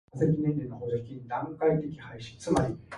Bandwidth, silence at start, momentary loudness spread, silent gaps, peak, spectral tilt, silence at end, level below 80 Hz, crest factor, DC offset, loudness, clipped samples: 11.5 kHz; 0.15 s; 13 LU; none; -10 dBFS; -7.5 dB/octave; 0 s; -52 dBFS; 20 dB; under 0.1%; -30 LUFS; under 0.1%